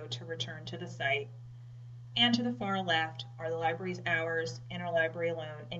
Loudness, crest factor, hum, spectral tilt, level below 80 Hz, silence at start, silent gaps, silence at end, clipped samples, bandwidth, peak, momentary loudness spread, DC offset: -33 LUFS; 20 dB; none; -5 dB/octave; -70 dBFS; 0 s; none; 0 s; under 0.1%; 8 kHz; -14 dBFS; 17 LU; under 0.1%